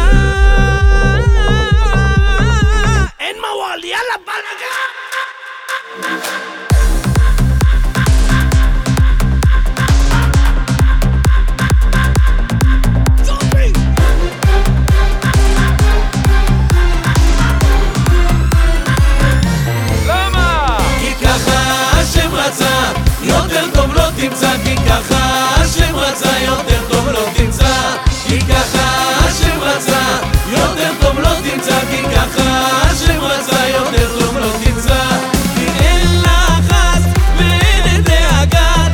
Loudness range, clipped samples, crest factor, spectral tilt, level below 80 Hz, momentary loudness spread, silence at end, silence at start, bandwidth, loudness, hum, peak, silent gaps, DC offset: 3 LU; under 0.1%; 12 dB; -4.5 dB/octave; -14 dBFS; 4 LU; 0 s; 0 s; 18.5 kHz; -13 LUFS; none; 0 dBFS; none; under 0.1%